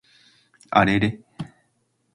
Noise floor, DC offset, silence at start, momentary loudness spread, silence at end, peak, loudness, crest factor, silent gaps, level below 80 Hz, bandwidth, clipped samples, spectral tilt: -69 dBFS; under 0.1%; 0.7 s; 20 LU; 0.7 s; -2 dBFS; -21 LUFS; 24 dB; none; -50 dBFS; 11 kHz; under 0.1%; -6.5 dB/octave